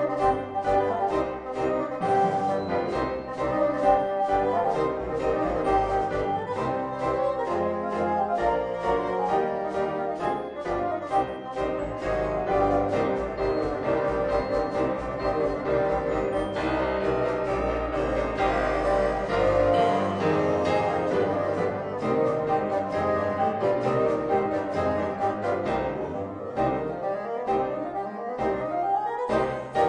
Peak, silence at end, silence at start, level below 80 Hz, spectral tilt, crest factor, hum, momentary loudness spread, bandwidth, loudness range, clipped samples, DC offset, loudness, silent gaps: -8 dBFS; 0 s; 0 s; -44 dBFS; -7 dB/octave; 18 dB; none; 5 LU; 10 kHz; 4 LU; under 0.1%; under 0.1%; -26 LUFS; none